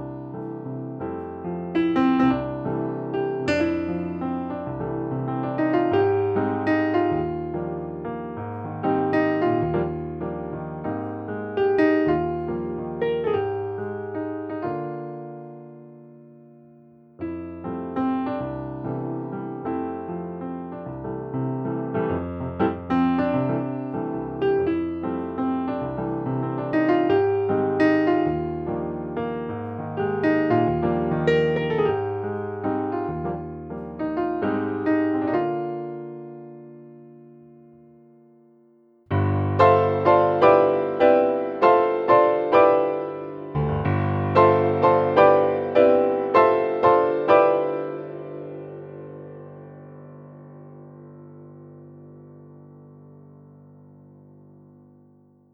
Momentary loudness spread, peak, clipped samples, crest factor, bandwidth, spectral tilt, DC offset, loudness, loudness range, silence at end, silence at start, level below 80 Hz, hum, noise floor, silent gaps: 17 LU; -2 dBFS; under 0.1%; 22 dB; 7.4 kHz; -9 dB/octave; under 0.1%; -23 LUFS; 13 LU; 2.4 s; 0 s; -54 dBFS; none; -57 dBFS; none